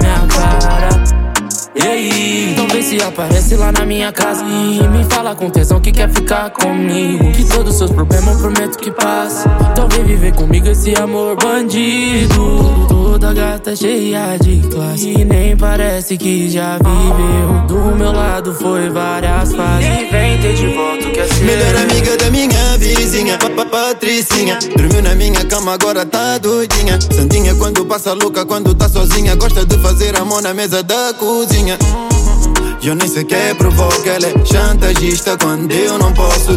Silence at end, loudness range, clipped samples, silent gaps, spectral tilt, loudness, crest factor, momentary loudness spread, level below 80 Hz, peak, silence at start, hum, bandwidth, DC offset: 0 s; 2 LU; under 0.1%; none; -4.5 dB/octave; -12 LUFS; 10 dB; 4 LU; -14 dBFS; 0 dBFS; 0 s; none; 17 kHz; under 0.1%